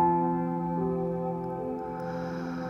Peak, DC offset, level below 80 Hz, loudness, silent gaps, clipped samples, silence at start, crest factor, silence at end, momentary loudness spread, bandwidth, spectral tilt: -16 dBFS; under 0.1%; -56 dBFS; -31 LUFS; none; under 0.1%; 0 s; 14 dB; 0 s; 7 LU; 6.4 kHz; -9.5 dB/octave